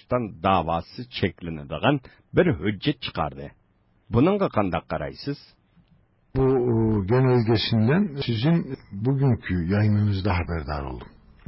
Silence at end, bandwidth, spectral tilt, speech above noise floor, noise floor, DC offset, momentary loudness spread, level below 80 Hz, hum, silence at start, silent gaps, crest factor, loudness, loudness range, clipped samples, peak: 0.4 s; 5.8 kHz; -11.5 dB/octave; 40 dB; -63 dBFS; under 0.1%; 12 LU; -42 dBFS; none; 0.1 s; none; 18 dB; -24 LUFS; 4 LU; under 0.1%; -6 dBFS